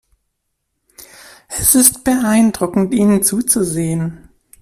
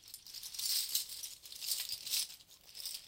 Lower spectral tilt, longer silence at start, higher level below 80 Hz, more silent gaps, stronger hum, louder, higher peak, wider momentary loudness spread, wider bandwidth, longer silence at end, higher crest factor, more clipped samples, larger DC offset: first, -4 dB/octave vs 3.5 dB/octave; first, 1 s vs 0 s; first, -44 dBFS vs -76 dBFS; neither; neither; first, -13 LUFS vs -37 LUFS; first, 0 dBFS vs -16 dBFS; about the same, 11 LU vs 13 LU; about the same, 16 kHz vs 17 kHz; first, 0.45 s vs 0 s; second, 16 dB vs 24 dB; neither; neither